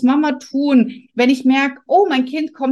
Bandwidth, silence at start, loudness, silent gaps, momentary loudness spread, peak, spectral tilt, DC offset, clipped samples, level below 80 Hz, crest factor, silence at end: 9.6 kHz; 0 s; -16 LUFS; none; 6 LU; -2 dBFS; -5 dB/octave; under 0.1%; under 0.1%; -66 dBFS; 12 dB; 0 s